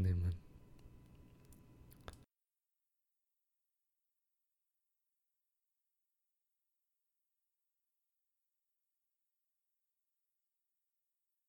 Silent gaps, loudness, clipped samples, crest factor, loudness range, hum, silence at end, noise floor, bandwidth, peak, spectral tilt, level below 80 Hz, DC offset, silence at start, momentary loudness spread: none; -42 LUFS; under 0.1%; 22 dB; 18 LU; none; 9.35 s; under -90 dBFS; 17.5 kHz; -28 dBFS; -8.5 dB/octave; -62 dBFS; under 0.1%; 0 s; 24 LU